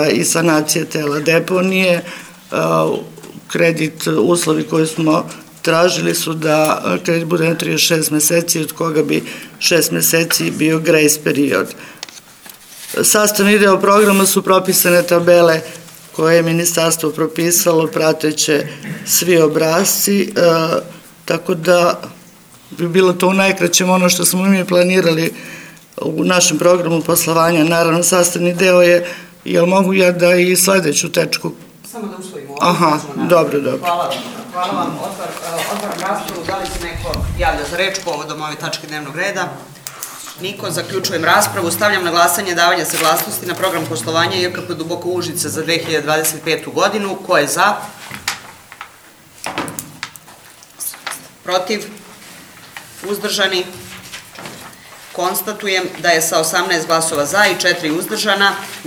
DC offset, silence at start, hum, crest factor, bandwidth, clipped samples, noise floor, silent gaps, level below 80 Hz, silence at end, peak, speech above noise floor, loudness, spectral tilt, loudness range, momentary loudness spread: under 0.1%; 0 s; none; 16 dB; over 20 kHz; under 0.1%; -43 dBFS; none; -44 dBFS; 0 s; 0 dBFS; 28 dB; -14 LUFS; -3.5 dB/octave; 9 LU; 17 LU